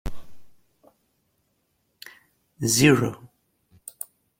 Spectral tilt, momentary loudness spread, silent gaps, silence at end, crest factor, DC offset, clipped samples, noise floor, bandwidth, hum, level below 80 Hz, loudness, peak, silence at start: -4 dB/octave; 28 LU; none; 1.15 s; 24 dB; under 0.1%; under 0.1%; -72 dBFS; 16.5 kHz; none; -48 dBFS; -20 LUFS; -4 dBFS; 0.05 s